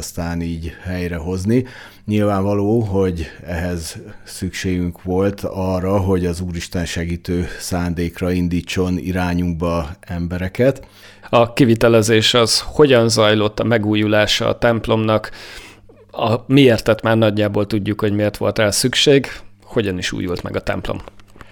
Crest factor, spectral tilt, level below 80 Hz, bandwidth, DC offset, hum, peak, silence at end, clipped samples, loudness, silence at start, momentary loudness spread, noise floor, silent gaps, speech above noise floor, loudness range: 16 dB; -5 dB/octave; -38 dBFS; 19 kHz; under 0.1%; none; -2 dBFS; 0.05 s; under 0.1%; -17 LUFS; 0 s; 14 LU; -42 dBFS; none; 25 dB; 7 LU